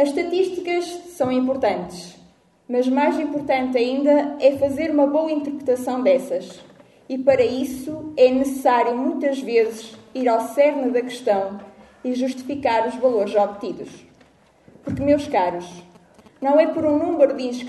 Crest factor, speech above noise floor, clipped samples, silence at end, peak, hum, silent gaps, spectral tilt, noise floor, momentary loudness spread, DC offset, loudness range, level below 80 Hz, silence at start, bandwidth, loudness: 18 dB; 34 dB; under 0.1%; 0 s; -4 dBFS; none; none; -5.5 dB/octave; -54 dBFS; 13 LU; under 0.1%; 4 LU; -56 dBFS; 0 s; 12 kHz; -21 LUFS